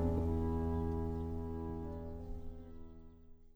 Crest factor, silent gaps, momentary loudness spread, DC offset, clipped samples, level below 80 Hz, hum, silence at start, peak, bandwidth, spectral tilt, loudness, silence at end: 16 dB; none; 19 LU; under 0.1%; under 0.1%; -44 dBFS; none; 0 s; -24 dBFS; over 20 kHz; -10.5 dB/octave; -40 LUFS; 0.05 s